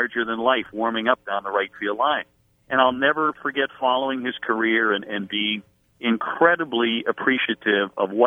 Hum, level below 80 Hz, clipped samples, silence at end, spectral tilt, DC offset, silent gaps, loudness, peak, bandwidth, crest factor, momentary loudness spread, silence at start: none; -66 dBFS; under 0.1%; 0 s; -6.5 dB/octave; under 0.1%; none; -22 LUFS; -2 dBFS; 3.9 kHz; 20 dB; 7 LU; 0 s